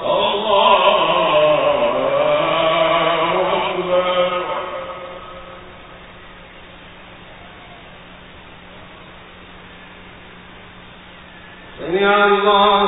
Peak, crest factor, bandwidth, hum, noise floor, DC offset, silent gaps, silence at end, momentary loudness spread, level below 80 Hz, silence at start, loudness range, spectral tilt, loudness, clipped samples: -2 dBFS; 18 dB; 4 kHz; none; -40 dBFS; under 0.1%; none; 0 s; 26 LU; -50 dBFS; 0 s; 24 LU; -9.5 dB/octave; -16 LUFS; under 0.1%